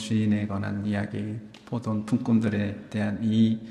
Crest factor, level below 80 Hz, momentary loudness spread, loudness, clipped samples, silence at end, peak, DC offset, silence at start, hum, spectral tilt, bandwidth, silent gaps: 16 dB; -62 dBFS; 10 LU; -27 LUFS; under 0.1%; 0 s; -12 dBFS; under 0.1%; 0 s; none; -7.5 dB/octave; 10.5 kHz; none